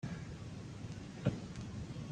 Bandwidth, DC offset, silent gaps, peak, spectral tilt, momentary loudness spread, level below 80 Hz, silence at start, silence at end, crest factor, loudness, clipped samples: 9.8 kHz; under 0.1%; none; -20 dBFS; -6.5 dB/octave; 8 LU; -58 dBFS; 0 s; 0 s; 22 dB; -44 LUFS; under 0.1%